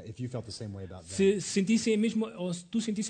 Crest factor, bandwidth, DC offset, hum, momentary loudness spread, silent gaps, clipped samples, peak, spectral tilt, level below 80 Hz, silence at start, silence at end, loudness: 16 dB; 9.4 kHz; under 0.1%; none; 14 LU; none; under 0.1%; -16 dBFS; -5 dB/octave; -64 dBFS; 0 s; 0 s; -30 LUFS